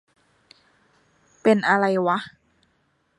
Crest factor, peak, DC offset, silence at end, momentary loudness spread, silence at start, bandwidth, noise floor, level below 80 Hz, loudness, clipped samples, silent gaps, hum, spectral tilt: 20 dB; -6 dBFS; under 0.1%; 0.9 s; 9 LU; 1.45 s; 11 kHz; -67 dBFS; -72 dBFS; -21 LUFS; under 0.1%; none; none; -6.5 dB/octave